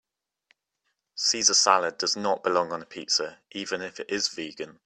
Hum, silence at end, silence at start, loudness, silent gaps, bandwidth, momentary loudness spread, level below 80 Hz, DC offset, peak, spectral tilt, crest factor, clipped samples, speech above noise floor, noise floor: none; 0.15 s; 1.15 s; -25 LUFS; none; 13 kHz; 16 LU; -74 dBFS; under 0.1%; -4 dBFS; -0.5 dB/octave; 24 dB; under 0.1%; 52 dB; -79 dBFS